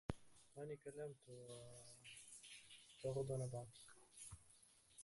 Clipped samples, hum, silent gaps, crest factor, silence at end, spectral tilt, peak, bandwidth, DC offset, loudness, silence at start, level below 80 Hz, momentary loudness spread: under 0.1%; none; none; 26 dB; 0 s; -5 dB/octave; -26 dBFS; 11.5 kHz; under 0.1%; -53 LUFS; 0.1 s; -72 dBFS; 17 LU